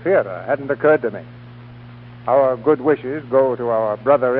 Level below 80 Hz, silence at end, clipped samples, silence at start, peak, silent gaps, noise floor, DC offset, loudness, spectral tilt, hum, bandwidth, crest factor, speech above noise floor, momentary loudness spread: -56 dBFS; 0 s; under 0.1%; 0 s; -2 dBFS; none; -38 dBFS; under 0.1%; -18 LUFS; -11.5 dB/octave; none; 4.8 kHz; 16 dB; 21 dB; 10 LU